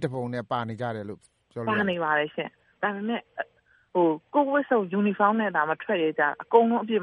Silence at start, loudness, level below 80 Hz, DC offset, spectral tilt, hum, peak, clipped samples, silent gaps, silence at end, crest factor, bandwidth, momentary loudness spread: 0 s; -26 LUFS; -72 dBFS; under 0.1%; -7.5 dB/octave; none; -4 dBFS; under 0.1%; none; 0 s; 22 dB; 11 kHz; 15 LU